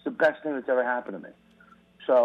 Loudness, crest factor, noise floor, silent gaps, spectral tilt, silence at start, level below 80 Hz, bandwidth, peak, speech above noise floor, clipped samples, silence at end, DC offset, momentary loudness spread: -27 LUFS; 16 dB; -57 dBFS; none; -6.5 dB/octave; 0.05 s; -74 dBFS; 6.4 kHz; -10 dBFS; 30 dB; under 0.1%; 0 s; under 0.1%; 17 LU